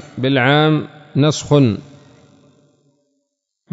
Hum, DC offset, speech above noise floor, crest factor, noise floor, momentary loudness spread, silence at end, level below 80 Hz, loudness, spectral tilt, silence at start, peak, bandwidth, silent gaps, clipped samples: none; under 0.1%; 59 dB; 18 dB; -73 dBFS; 9 LU; 1.9 s; -56 dBFS; -16 LUFS; -6 dB/octave; 0 s; -2 dBFS; 7.8 kHz; none; under 0.1%